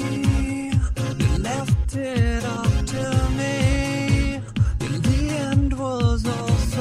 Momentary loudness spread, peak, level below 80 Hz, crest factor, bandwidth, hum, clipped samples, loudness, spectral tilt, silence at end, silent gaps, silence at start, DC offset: 3 LU; -6 dBFS; -26 dBFS; 14 dB; 13.5 kHz; none; under 0.1%; -22 LUFS; -6 dB/octave; 0 s; none; 0 s; under 0.1%